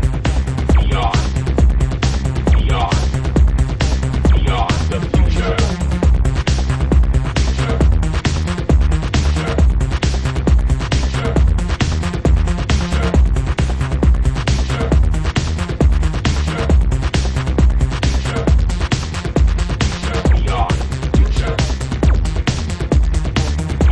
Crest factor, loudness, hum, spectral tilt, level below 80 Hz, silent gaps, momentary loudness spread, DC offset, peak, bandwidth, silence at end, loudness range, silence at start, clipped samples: 12 dB; -17 LUFS; none; -6 dB/octave; -16 dBFS; none; 3 LU; under 0.1%; -2 dBFS; 10.5 kHz; 0 s; 1 LU; 0 s; under 0.1%